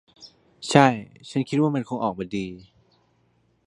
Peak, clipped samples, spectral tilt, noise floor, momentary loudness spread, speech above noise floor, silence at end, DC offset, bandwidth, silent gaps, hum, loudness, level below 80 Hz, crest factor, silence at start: 0 dBFS; under 0.1%; -6 dB/octave; -65 dBFS; 16 LU; 43 dB; 1.05 s; under 0.1%; 11.5 kHz; none; none; -23 LUFS; -62 dBFS; 24 dB; 0.2 s